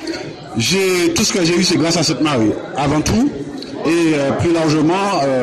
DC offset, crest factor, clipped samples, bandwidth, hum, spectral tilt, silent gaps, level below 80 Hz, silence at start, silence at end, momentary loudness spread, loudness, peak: under 0.1%; 12 dB; under 0.1%; 13.5 kHz; none; -4.5 dB/octave; none; -40 dBFS; 0 s; 0 s; 8 LU; -15 LUFS; -4 dBFS